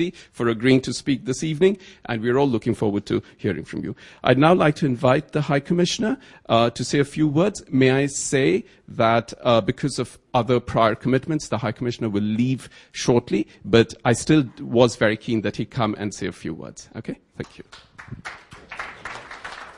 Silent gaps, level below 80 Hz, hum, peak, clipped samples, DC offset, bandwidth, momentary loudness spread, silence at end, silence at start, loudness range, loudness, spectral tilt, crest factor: none; -52 dBFS; none; -2 dBFS; under 0.1%; under 0.1%; 11.5 kHz; 17 LU; 0.05 s; 0 s; 7 LU; -21 LUFS; -5.5 dB/octave; 20 dB